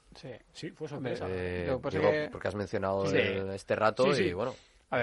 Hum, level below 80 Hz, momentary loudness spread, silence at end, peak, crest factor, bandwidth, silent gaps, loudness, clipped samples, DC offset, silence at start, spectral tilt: none; -62 dBFS; 17 LU; 0 s; -12 dBFS; 20 dB; 11.5 kHz; none; -31 LUFS; under 0.1%; under 0.1%; 0.15 s; -6 dB/octave